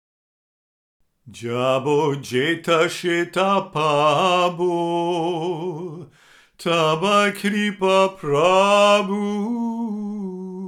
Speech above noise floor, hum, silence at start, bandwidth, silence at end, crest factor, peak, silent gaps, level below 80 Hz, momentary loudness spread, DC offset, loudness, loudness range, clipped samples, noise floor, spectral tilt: 33 dB; none; 1.25 s; 15.5 kHz; 0 s; 18 dB; -4 dBFS; none; -66 dBFS; 12 LU; under 0.1%; -20 LUFS; 4 LU; under 0.1%; -53 dBFS; -5 dB/octave